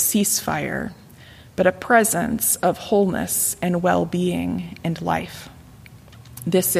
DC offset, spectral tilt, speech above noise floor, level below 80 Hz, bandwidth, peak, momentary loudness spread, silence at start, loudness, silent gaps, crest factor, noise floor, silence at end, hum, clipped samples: under 0.1%; -4 dB/octave; 24 dB; -50 dBFS; 15.5 kHz; -2 dBFS; 14 LU; 0 s; -21 LUFS; none; 20 dB; -45 dBFS; 0 s; none; under 0.1%